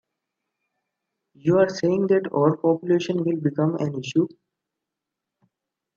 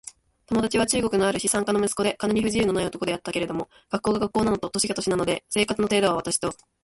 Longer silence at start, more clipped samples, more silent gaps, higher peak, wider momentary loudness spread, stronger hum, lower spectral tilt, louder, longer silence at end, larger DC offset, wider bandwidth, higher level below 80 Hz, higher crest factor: first, 1.45 s vs 0.05 s; neither; neither; about the same, -6 dBFS vs -8 dBFS; about the same, 5 LU vs 6 LU; neither; first, -7.5 dB/octave vs -4 dB/octave; about the same, -22 LUFS vs -24 LUFS; first, 1.7 s vs 0.3 s; neither; second, 7.4 kHz vs 12 kHz; second, -70 dBFS vs -50 dBFS; about the same, 20 dB vs 18 dB